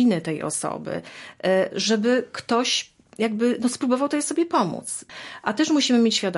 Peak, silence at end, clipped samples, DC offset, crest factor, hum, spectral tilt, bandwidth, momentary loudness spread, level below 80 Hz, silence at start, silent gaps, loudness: -6 dBFS; 0 s; under 0.1%; under 0.1%; 16 dB; none; -3.5 dB/octave; 11.5 kHz; 13 LU; -68 dBFS; 0 s; none; -23 LUFS